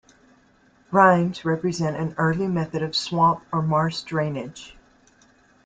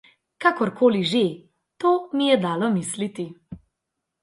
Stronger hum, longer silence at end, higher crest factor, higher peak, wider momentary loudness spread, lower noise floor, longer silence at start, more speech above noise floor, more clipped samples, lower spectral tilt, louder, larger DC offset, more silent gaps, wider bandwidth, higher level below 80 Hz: neither; first, 0.95 s vs 0.65 s; about the same, 20 dB vs 18 dB; about the same, -2 dBFS vs -4 dBFS; second, 9 LU vs 14 LU; second, -58 dBFS vs -82 dBFS; first, 0.9 s vs 0.4 s; second, 36 dB vs 60 dB; neither; about the same, -6 dB/octave vs -5 dB/octave; about the same, -22 LUFS vs -22 LUFS; neither; neither; second, 9 kHz vs 11.5 kHz; first, -58 dBFS vs -64 dBFS